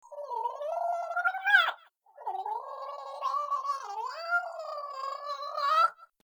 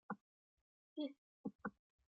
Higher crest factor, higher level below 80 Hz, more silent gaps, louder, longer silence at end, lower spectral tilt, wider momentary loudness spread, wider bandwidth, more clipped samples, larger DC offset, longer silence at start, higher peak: about the same, 22 dB vs 20 dB; about the same, under -90 dBFS vs -86 dBFS; second, none vs 0.21-0.96 s, 1.18-1.44 s, 1.55-1.59 s; first, -31 LUFS vs -51 LUFS; second, 0.2 s vs 0.4 s; second, 2.5 dB/octave vs -4.5 dB/octave; first, 15 LU vs 5 LU; first, over 20 kHz vs 4.9 kHz; neither; neither; about the same, 0.05 s vs 0.1 s; first, -10 dBFS vs -32 dBFS